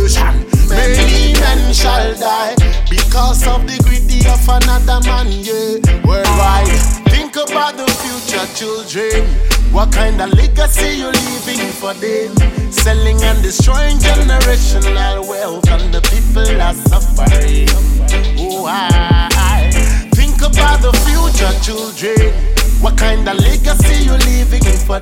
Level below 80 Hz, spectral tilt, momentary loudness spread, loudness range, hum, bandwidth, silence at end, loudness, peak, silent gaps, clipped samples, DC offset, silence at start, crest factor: -12 dBFS; -4.5 dB/octave; 6 LU; 2 LU; none; 16.5 kHz; 0 s; -13 LUFS; 0 dBFS; none; under 0.1%; under 0.1%; 0 s; 10 dB